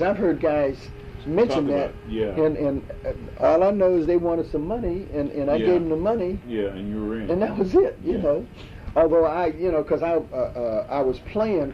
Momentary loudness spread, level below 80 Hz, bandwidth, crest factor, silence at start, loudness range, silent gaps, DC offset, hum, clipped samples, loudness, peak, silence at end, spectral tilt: 9 LU; -42 dBFS; 7.6 kHz; 14 dB; 0 s; 2 LU; none; under 0.1%; none; under 0.1%; -23 LUFS; -8 dBFS; 0 s; -8.5 dB/octave